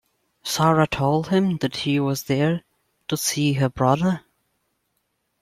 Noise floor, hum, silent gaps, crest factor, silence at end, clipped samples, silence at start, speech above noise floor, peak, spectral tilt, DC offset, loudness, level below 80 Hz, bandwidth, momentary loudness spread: -73 dBFS; none; none; 18 dB; 1.2 s; under 0.1%; 0.45 s; 52 dB; -4 dBFS; -5.5 dB/octave; under 0.1%; -22 LUFS; -52 dBFS; 16 kHz; 10 LU